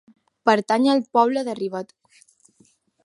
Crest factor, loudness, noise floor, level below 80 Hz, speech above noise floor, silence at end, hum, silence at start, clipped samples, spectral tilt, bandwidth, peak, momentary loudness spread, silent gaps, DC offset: 22 dB; -21 LUFS; -60 dBFS; -74 dBFS; 40 dB; 1.2 s; none; 0.45 s; under 0.1%; -5 dB/octave; 11.5 kHz; -2 dBFS; 12 LU; none; under 0.1%